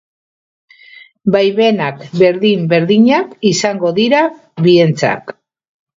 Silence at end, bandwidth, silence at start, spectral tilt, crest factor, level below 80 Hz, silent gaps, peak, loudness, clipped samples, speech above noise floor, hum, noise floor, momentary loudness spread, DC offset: 0.65 s; 7.8 kHz; 1.25 s; -5.5 dB/octave; 14 dB; -58 dBFS; none; 0 dBFS; -13 LUFS; under 0.1%; 29 dB; none; -41 dBFS; 8 LU; under 0.1%